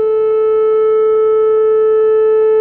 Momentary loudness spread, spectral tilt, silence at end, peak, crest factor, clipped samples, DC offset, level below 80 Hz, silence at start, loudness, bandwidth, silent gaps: 2 LU; -7.5 dB/octave; 0 s; -6 dBFS; 4 dB; under 0.1%; under 0.1%; -56 dBFS; 0 s; -12 LUFS; 3.2 kHz; none